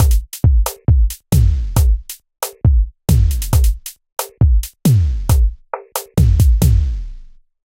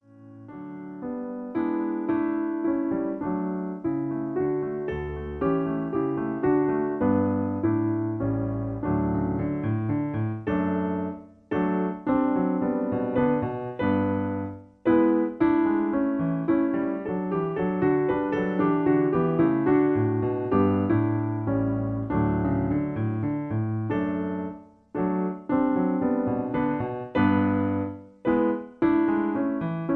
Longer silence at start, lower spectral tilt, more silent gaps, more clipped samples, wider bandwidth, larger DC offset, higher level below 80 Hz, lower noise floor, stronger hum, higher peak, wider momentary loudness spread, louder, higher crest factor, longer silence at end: second, 0 s vs 0.15 s; second, -6 dB/octave vs -11 dB/octave; neither; neither; first, 16.5 kHz vs 4.1 kHz; neither; first, -16 dBFS vs -48 dBFS; second, -37 dBFS vs -46 dBFS; neither; first, 0 dBFS vs -10 dBFS; first, 13 LU vs 8 LU; first, -16 LUFS vs -26 LUFS; about the same, 14 dB vs 16 dB; first, 0.5 s vs 0 s